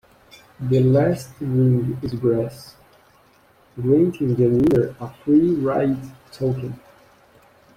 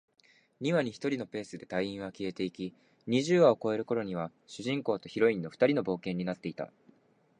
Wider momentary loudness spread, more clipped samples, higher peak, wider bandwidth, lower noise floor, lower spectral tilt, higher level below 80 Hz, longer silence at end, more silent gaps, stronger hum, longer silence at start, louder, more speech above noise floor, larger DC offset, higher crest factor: about the same, 14 LU vs 15 LU; neither; first, -6 dBFS vs -12 dBFS; first, 14.5 kHz vs 10 kHz; second, -55 dBFS vs -65 dBFS; first, -9 dB/octave vs -6 dB/octave; first, -50 dBFS vs -70 dBFS; first, 1 s vs 0.7 s; neither; neither; about the same, 0.6 s vs 0.6 s; first, -20 LUFS vs -31 LUFS; about the same, 36 dB vs 34 dB; neither; about the same, 16 dB vs 20 dB